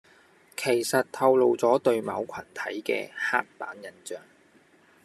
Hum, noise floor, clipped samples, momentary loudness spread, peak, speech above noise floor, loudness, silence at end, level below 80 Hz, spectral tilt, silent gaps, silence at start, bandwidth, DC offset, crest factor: none; -59 dBFS; under 0.1%; 19 LU; -8 dBFS; 33 dB; -26 LUFS; 0.85 s; -76 dBFS; -4 dB/octave; none; 0.6 s; 13.5 kHz; under 0.1%; 20 dB